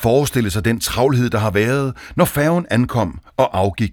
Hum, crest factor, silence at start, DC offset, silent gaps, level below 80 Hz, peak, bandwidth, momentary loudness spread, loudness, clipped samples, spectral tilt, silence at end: none; 18 dB; 0 s; under 0.1%; none; -38 dBFS; 0 dBFS; over 20 kHz; 4 LU; -18 LUFS; under 0.1%; -6 dB/octave; 0 s